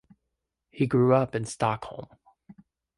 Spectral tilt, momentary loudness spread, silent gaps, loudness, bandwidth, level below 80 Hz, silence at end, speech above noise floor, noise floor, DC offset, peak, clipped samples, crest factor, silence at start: -7 dB/octave; 17 LU; none; -26 LUFS; 11.5 kHz; -62 dBFS; 0.45 s; 57 dB; -83 dBFS; under 0.1%; -8 dBFS; under 0.1%; 20 dB; 0.75 s